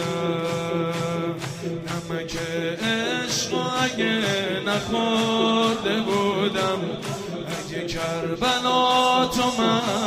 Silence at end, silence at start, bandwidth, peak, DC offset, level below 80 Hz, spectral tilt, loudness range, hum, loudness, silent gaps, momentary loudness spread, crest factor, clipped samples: 0 s; 0 s; 15.5 kHz; -8 dBFS; under 0.1%; -52 dBFS; -4 dB/octave; 4 LU; none; -23 LUFS; none; 10 LU; 16 dB; under 0.1%